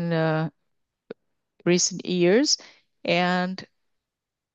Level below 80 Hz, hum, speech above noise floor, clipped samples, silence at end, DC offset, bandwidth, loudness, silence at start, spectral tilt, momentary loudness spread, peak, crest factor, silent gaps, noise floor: -74 dBFS; none; 64 dB; under 0.1%; 0.9 s; under 0.1%; 8.4 kHz; -23 LUFS; 0 s; -4 dB/octave; 12 LU; -8 dBFS; 18 dB; none; -86 dBFS